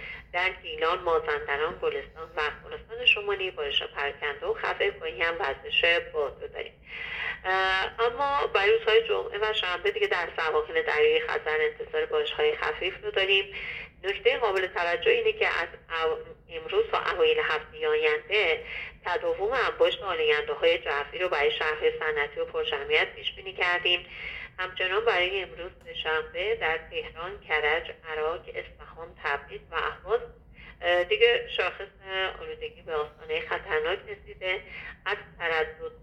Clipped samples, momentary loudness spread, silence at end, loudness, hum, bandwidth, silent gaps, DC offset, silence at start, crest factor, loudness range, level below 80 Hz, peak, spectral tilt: under 0.1%; 13 LU; 0 s; -27 LUFS; none; 8.2 kHz; none; under 0.1%; 0 s; 20 dB; 5 LU; -54 dBFS; -8 dBFS; -4 dB/octave